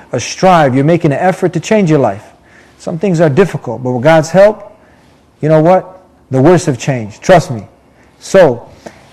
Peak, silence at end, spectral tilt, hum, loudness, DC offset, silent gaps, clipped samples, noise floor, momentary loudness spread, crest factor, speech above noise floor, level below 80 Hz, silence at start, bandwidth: 0 dBFS; 0.45 s; -6.5 dB/octave; none; -10 LUFS; under 0.1%; none; 1%; -45 dBFS; 14 LU; 12 dB; 36 dB; -42 dBFS; 0.15 s; 13 kHz